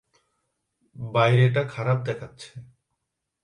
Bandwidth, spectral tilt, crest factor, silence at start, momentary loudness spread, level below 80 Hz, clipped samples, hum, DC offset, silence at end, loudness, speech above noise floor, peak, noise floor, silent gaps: 10 kHz; -7 dB/octave; 20 dB; 0.95 s; 22 LU; -64 dBFS; under 0.1%; none; under 0.1%; 0.8 s; -23 LUFS; 58 dB; -6 dBFS; -81 dBFS; none